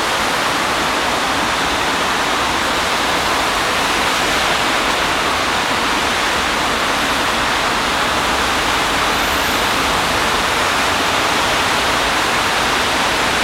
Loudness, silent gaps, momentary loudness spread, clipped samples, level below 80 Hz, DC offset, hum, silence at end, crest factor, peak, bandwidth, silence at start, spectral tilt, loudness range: -15 LUFS; none; 1 LU; under 0.1%; -36 dBFS; under 0.1%; none; 0 s; 14 dB; -2 dBFS; 16.5 kHz; 0 s; -2 dB/octave; 1 LU